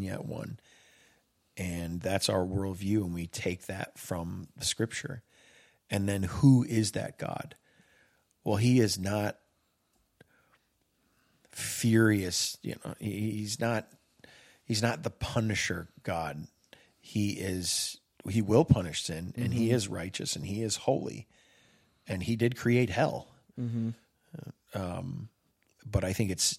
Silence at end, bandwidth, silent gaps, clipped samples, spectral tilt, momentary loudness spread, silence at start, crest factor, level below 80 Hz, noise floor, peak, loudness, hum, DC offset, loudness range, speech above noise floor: 0 s; 16 kHz; none; under 0.1%; -5 dB/octave; 16 LU; 0 s; 24 dB; -58 dBFS; -74 dBFS; -8 dBFS; -31 LUFS; none; under 0.1%; 5 LU; 44 dB